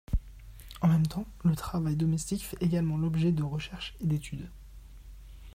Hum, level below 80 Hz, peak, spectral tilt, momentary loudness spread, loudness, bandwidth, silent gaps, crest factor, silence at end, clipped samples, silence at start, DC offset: none; -44 dBFS; -16 dBFS; -7 dB/octave; 18 LU; -30 LUFS; 16 kHz; none; 14 dB; 0.05 s; under 0.1%; 0.1 s; under 0.1%